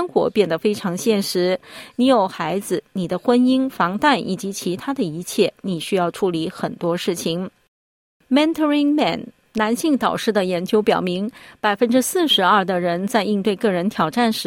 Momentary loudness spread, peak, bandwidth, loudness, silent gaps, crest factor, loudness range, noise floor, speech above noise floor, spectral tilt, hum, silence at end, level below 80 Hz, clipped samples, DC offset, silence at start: 9 LU; -4 dBFS; 17 kHz; -20 LUFS; 7.68-8.20 s; 16 dB; 4 LU; under -90 dBFS; over 71 dB; -4.5 dB/octave; none; 0 s; -60 dBFS; under 0.1%; under 0.1%; 0 s